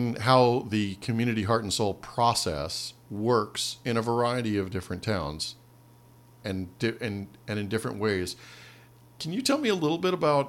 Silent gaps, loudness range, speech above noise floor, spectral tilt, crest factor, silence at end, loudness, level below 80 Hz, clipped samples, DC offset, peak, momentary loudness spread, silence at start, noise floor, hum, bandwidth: none; 6 LU; 27 dB; -5 dB/octave; 22 dB; 0 s; -28 LUFS; -58 dBFS; under 0.1%; under 0.1%; -6 dBFS; 11 LU; 0 s; -55 dBFS; none; 16.5 kHz